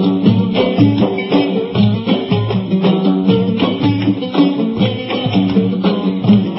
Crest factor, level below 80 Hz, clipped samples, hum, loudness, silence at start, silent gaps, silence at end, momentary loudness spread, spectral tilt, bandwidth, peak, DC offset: 14 dB; -46 dBFS; under 0.1%; none; -14 LUFS; 0 s; none; 0 s; 4 LU; -11 dB/octave; 5.8 kHz; 0 dBFS; under 0.1%